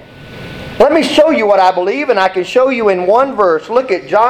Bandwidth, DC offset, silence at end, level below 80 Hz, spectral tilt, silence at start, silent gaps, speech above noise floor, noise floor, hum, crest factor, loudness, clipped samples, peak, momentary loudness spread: 14.5 kHz; under 0.1%; 0 s; -46 dBFS; -5 dB/octave; 0.15 s; none; 20 dB; -31 dBFS; none; 12 dB; -11 LUFS; under 0.1%; 0 dBFS; 9 LU